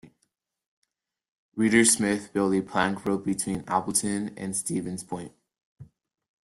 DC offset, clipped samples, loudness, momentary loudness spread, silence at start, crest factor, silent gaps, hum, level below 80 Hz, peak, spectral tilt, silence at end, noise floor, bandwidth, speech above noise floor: under 0.1%; under 0.1%; -25 LUFS; 15 LU; 0.05 s; 22 dB; 0.66-0.82 s, 1.29-1.52 s, 5.65-5.76 s; none; -62 dBFS; -6 dBFS; -3.5 dB/octave; 0.65 s; -76 dBFS; 12.5 kHz; 50 dB